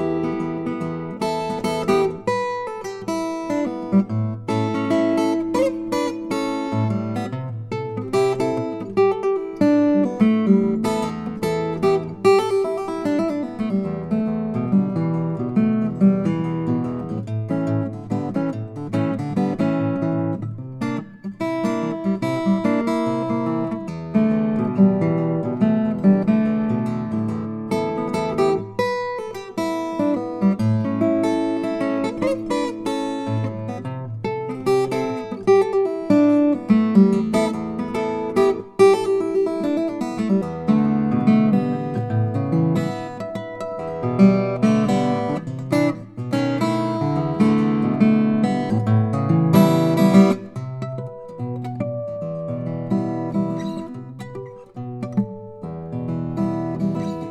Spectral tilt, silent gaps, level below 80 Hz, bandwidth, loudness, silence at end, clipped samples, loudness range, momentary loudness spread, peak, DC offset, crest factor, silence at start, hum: -8 dB/octave; none; -54 dBFS; 12.5 kHz; -21 LUFS; 0 s; under 0.1%; 6 LU; 12 LU; 0 dBFS; under 0.1%; 20 dB; 0 s; none